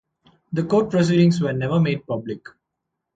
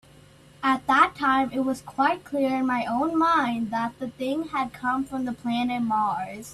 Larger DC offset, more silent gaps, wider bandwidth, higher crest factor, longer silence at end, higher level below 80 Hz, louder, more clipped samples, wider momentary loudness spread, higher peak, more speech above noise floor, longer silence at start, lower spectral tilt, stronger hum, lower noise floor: neither; neither; second, 7.8 kHz vs 13.5 kHz; about the same, 16 dB vs 20 dB; first, 0.8 s vs 0 s; about the same, -56 dBFS vs -60 dBFS; first, -20 LUFS vs -25 LUFS; neither; first, 12 LU vs 9 LU; about the same, -6 dBFS vs -4 dBFS; first, 61 dB vs 27 dB; about the same, 0.5 s vs 0.6 s; first, -7.5 dB/octave vs -5 dB/octave; neither; first, -80 dBFS vs -52 dBFS